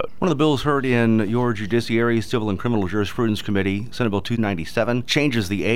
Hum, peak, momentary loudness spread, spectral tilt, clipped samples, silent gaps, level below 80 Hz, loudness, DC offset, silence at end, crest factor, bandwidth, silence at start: none; -6 dBFS; 5 LU; -6 dB/octave; under 0.1%; none; -46 dBFS; -21 LUFS; 2%; 0 s; 16 dB; 16 kHz; 0 s